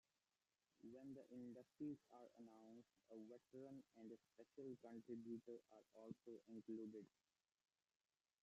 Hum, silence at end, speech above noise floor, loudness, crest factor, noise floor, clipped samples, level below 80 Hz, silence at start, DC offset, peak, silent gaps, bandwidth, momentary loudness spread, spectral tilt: none; 1.35 s; over 31 dB; -60 LUFS; 18 dB; under -90 dBFS; under 0.1%; under -90 dBFS; 0.8 s; under 0.1%; -42 dBFS; none; 8 kHz; 11 LU; -8 dB/octave